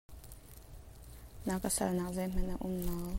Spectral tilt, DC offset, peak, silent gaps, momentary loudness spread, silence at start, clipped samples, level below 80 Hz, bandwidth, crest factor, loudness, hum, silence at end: -5 dB/octave; under 0.1%; -20 dBFS; none; 21 LU; 0.1 s; under 0.1%; -44 dBFS; 16.5 kHz; 16 dB; -36 LUFS; none; 0 s